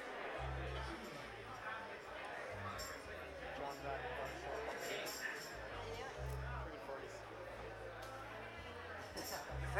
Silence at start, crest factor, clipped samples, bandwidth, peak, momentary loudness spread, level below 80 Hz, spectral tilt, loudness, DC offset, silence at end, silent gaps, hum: 0 s; 22 dB; under 0.1%; 18 kHz; -26 dBFS; 6 LU; -56 dBFS; -4 dB/octave; -47 LUFS; under 0.1%; 0 s; none; none